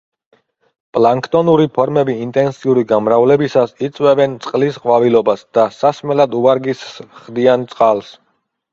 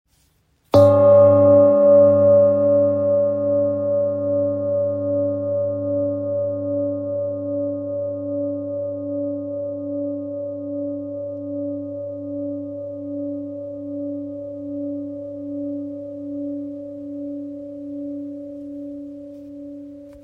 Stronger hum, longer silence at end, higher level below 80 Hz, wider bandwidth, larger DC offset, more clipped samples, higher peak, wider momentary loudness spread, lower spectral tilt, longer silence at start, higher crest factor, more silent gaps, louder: neither; first, 0.6 s vs 0 s; about the same, -58 dBFS vs -62 dBFS; first, 7.6 kHz vs 5.2 kHz; neither; neither; about the same, 0 dBFS vs -2 dBFS; second, 7 LU vs 20 LU; second, -7 dB/octave vs -10 dB/octave; first, 0.95 s vs 0.75 s; about the same, 14 dB vs 18 dB; neither; first, -14 LUFS vs -20 LUFS